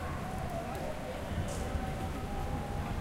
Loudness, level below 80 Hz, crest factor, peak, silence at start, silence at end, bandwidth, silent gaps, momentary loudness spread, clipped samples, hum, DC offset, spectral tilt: -38 LUFS; -42 dBFS; 14 dB; -22 dBFS; 0 s; 0 s; 16.5 kHz; none; 2 LU; under 0.1%; none; under 0.1%; -6 dB/octave